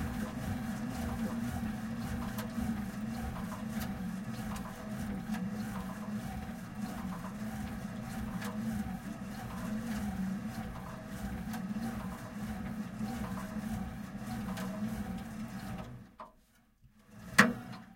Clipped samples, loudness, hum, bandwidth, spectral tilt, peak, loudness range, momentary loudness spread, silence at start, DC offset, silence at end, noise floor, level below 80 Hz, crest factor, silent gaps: under 0.1%; -38 LUFS; none; 16.5 kHz; -5.5 dB/octave; -6 dBFS; 2 LU; 6 LU; 0 s; under 0.1%; 0 s; -66 dBFS; -52 dBFS; 32 dB; none